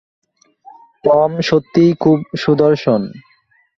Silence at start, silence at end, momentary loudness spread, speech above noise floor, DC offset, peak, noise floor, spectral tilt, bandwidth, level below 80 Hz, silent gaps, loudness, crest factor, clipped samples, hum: 1.05 s; 0.55 s; 6 LU; 43 dB; under 0.1%; -2 dBFS; -56 dBFS; -7.5 dB/octave; 7.2 kHz; -54 dBFS; none; -14 LUFS; 14 dB; under 0.1%; none